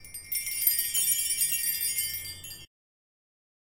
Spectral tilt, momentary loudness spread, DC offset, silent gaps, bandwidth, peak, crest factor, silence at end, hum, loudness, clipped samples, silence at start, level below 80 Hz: 2 dB/octave; 16 LU; under 0.1%; none; 17 kHz; -8 dBFS; 24 dB; 1 s; none; -26 LUFS; under 0.1%; 0 s; -62 dBFS